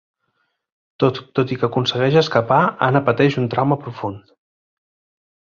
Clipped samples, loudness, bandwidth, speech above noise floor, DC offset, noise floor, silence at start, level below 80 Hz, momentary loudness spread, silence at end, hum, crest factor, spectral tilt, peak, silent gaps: under 0.1%; -18 LUFS; 7.2 kHz; 52 dB; under 0.1%; -70 dBFS; 1 s; -56 dBFS; 7 LU; 1.3 s; none; 18 dB; -7 dB/octave; -2 dBFS; none